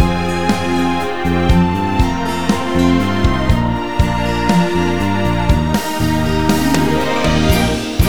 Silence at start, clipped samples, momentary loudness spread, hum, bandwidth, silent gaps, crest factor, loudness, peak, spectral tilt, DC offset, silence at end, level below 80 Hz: 0 s; under 0.1%; 3 LU; none; over 20 kHz; none; 14 dB; -15 LUFS; 0 dBFS; -6 dB/octave; 5%; 0 s; -24 dBFS